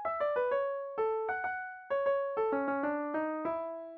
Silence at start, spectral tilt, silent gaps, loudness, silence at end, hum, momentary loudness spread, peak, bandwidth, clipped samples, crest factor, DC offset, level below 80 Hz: 0 s; -7.5 dB/octave; none; -34 LUFS; 0 s; none; 5 LU; -20 dBFS; 4.6 kHz; under 0.1%; 12 dB; under 0.1%; -74 dBFS